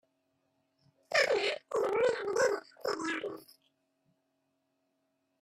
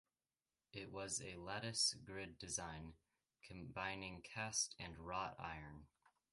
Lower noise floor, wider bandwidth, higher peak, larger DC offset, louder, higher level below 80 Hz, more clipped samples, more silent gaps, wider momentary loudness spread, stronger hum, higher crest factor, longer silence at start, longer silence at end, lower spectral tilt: second, -79 dBFS vs under -90 dBFS; first, 15 kHz vs 11.5 kHz; first, -14 dBFS vs -26 dBFS; neither; first, -32 LUFS vs -45 LUFS; second, -78 dBFS vs -68 dBFS; neither; neither; second, 9 LU vs 17 LU; neither; about the same, 20 dB vs 24 dB; first, 1.1 s vs 0.75 s; first, 2 s vs 0.45 s; about the same, -2 dB/octave vs -2 dB/octave